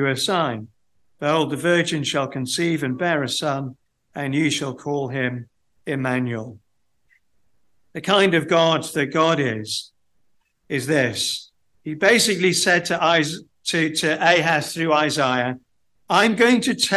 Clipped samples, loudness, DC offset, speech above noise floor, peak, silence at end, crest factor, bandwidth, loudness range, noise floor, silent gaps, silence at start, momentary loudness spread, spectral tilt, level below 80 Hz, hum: under 0.1%; -20 LUFS; under 0.1%; 52 dB; -2 dBFS; 0 s; 18 dB; 12.5 kHz; 7 LU; -72 dBFS; none; 0 s; 12 LU; -4 dB/octave; -64 dBFS; none